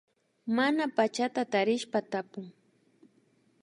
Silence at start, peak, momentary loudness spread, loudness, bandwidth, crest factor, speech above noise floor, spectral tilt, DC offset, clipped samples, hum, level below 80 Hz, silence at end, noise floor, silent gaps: 0.45 s; -12 dBFS; 16 LU; -29 LUFS; 11.5 kHz; 20 dB; 38 dB; -4.5 dB/octave; under 0.1%; under 0.1%; none; -84 dBFS; 1.1 s; -68 dBFS; none